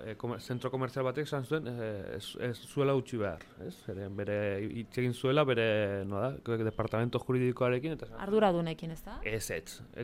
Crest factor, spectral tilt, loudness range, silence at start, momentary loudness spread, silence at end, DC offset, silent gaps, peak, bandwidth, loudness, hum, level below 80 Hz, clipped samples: 18 dB; -6.5 dB/octave; 4 LU; 0 s; 12 LU; 0 s; under 0.1%; none; -14 dBFS; 16 kHz; -33 LUFS; none; -56 dBFS; under 0.1%